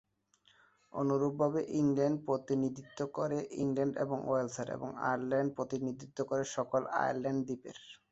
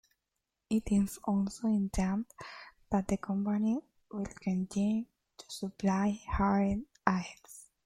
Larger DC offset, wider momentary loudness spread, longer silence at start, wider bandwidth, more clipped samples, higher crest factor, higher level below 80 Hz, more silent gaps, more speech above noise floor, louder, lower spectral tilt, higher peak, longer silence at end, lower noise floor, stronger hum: neither; second, 8 LU vs 15 LU; first, 0.95 s vs 0.7 s; second, 8 kHz vs 15.5 kHz; neither; second, 18 dB vs 24 dB; second, -72 dBFS vs -50 dBFS; neither; second, 37 dB vs 54 dB; about the same, -35 LUFS vs -33 LUFS; about the same, -6.5 dB/octave vs -6.5 dB/octave; second, -18 dBFS vs -8 dBFS; about the same, 0.15 s vs 0.25 s; second, -71 dBFS vs -86 dBFS; neither